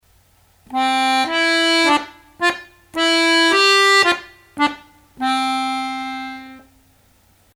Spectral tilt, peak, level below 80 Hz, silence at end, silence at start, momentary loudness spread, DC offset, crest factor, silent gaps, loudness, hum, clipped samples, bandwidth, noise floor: -1 dB/octave; 0 dBFS; -60 dBFS; 1 s; 0.7 s; 17 LU; under 0.1%; 18 dB; none; -16 LUFS; none; under 0.1%; 17 kHz; -55 dBFS